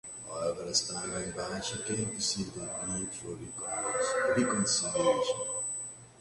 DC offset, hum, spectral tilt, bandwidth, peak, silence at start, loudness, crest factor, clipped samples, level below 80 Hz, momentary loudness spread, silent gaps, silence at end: under 0.1%; none; -2.5 dB/octave; 11.5 kHz; -14 dBFS; 0.05 s; -32 LUFS; 18 dB; under 0.1%; -60 dBFS; 10 LU; none; 0 s